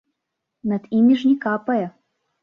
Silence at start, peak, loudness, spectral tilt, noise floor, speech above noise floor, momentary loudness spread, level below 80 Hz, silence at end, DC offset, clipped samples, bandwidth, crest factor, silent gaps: 0.65 s; -8 dBFS; -20 LUFS; -8 dB/octave; -80 dBFS; 61 dB; 12 LU; -66 dBFS; 0.55 s; under 0.1%; under 0.1%; 6.4 kHz; 14 dB; none